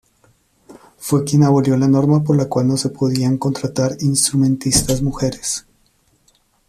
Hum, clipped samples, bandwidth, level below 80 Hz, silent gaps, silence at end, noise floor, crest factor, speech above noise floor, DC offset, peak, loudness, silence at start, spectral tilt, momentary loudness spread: none; under 0.1%; 14.5 kHz; -40 dBFS; none; 1.1 s; -59 dBFS; 16 dB; 43 dB; under 0.1%; 0 dBFS; -17 LUFS; 0.7 s; -5.5 dB/octave; 7 LU